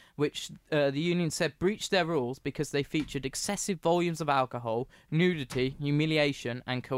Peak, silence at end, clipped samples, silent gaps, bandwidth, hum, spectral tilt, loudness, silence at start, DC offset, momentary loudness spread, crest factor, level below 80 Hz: -14 dBFS; 0 s; under 0.1%; none; 16 kHz; none; -5 dB/octave; -30 LUFS; 0.2 s; under 0.1%; 7 LU; 16 dB; -56 dBFS